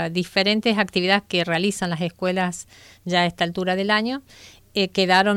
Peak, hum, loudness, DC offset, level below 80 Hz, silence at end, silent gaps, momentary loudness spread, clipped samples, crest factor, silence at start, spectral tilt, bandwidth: -4 dBFS; none; -21 LUFS; under 0.1%; -58 dBFS; 0 s; none; 9 LU; under 0.1%; 18 dB; 0 s; -4.5 dB/octave; 15.5 kHz